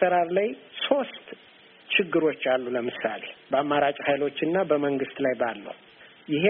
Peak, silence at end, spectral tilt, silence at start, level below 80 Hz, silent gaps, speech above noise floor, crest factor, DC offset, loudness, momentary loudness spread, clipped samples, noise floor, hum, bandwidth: -6 dBFS; 0 s; -3 dB/octave; 0 s; -70 dBFS; none; 27 dB; 20 dB; under 0.1%; -26 LUFS; 17 LU; under 0.1%; -53 dBFS; none; 4 kHz